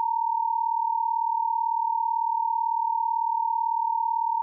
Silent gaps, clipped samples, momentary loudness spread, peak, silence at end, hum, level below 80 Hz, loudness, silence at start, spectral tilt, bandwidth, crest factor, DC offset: none; under 0.1%; 0 LU; -20 dBFS; 0 s; none; under -90 dBFS; -26 LUFS; 0 s; 7.5 dB/octave; 1.1 kHz; 6 dB; under 0.1%